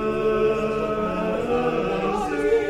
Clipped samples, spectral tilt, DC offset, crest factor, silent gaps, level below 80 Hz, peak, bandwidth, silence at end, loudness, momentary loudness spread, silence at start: under 0.1%; -6.5 dB/octave; under 0.1%; 12 dB; none; -42 dBFS; -10 dBFS; 12 kHz; 0 s; -23 LUFS; 3 LU; 0 s